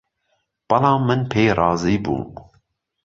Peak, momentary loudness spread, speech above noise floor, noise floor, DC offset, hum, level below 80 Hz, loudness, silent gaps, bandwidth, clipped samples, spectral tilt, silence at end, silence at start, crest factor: -2 dBFS; 9 LU; 52 dB; -70 dBFS; under 0.1%; none; -46 dBFS; -19 LUFS; none; 7.6 kHz; under 0.1%; -7 dB/octave; 0.65 s; 0.7 s; 18 dB